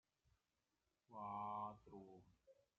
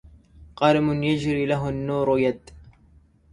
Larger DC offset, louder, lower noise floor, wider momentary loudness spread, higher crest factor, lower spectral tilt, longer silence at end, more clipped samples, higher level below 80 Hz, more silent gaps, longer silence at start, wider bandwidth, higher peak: neither; second, -52 LUFS vs -23 LUFS; first, under -90 dBFS vs -56 dBFS; first, 16 LU vs 6 LU; about the same, 18 dB vs 20 dB; about the same, -6.5 dB/octave vs -7 dB/octave; second, 0.25 s vs 0.6 s; neither; second, -84 dBFS vs -48 dBFS; neither; first, 1.1 s vs 0.4 s; second, 7 kHz vs 11 kHz; second, -38 dBFS vs -4 dBFS